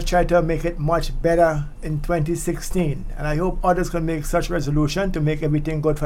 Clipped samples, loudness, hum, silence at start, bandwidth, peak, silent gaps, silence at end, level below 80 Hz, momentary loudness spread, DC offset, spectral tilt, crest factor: under 0.1%; -22 LUFS; none; 0 s; 16 kHz; -6 dBFS; none; 0 s; -28 dBFS; 7 LU; under 0.1%; -6.5 dB/octave; 16 dB